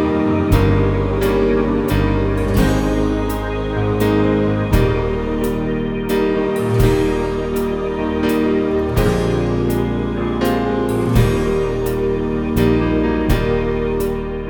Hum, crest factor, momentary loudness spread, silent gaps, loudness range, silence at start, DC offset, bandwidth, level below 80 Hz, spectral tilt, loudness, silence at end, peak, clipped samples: none; 16 dB; 5 LU; none; 1 LU; 0 s; under 0.1%; over 20 kHz; -26 dBFS; -7.5 dB/octave; -18 LUFS; 0 s; 0 dBFS; under 0.1%